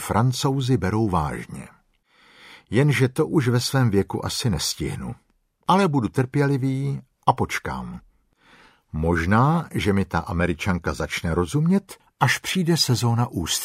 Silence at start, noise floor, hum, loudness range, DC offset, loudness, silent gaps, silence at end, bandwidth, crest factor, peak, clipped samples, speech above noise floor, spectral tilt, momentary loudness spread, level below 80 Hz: 0 s; -60 dBFS; none; 2 LU; under 0.1%; -22 LUFS; none; 0 s; 16 kHz; 20 dB; -4 dBFS; under 0.1%; 38 dB; -5.5 dB/octave; 11 LU; -42 dBFS